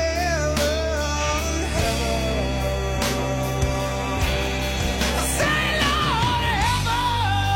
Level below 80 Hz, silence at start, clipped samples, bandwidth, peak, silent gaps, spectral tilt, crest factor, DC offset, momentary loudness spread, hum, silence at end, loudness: -28 dBFS; 0 s; under 0.1%; 16.5 kHz; -6 dBFS; none; -4 dB/octave; 16 dB; under 0.1%; 4 LU; none; 0 s; -22 LUFS